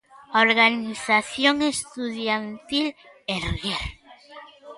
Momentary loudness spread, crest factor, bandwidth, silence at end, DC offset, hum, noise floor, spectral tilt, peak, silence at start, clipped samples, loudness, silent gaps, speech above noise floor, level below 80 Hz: 12 LU; 20 dB; 11.5 kHz; 0 s; under 0.1%; none; -46 dBFS; -3 dB/octave; -4 dBFS; 0.15 s; under 0.1%; -23 LUFS; none; 23 dB; -46 dBFS